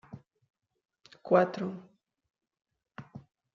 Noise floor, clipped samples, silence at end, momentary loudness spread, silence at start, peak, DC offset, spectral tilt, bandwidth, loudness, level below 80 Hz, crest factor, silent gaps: -52 dBFS; under 0.1%; 0.35 s; 26 LU; 0.1 s; -10 dBFS; under 0.1%; -6 dB/octave; 7.2 kHz; -29 LUFS; -76 dBFS; 24 dB; 0.50-0.54 s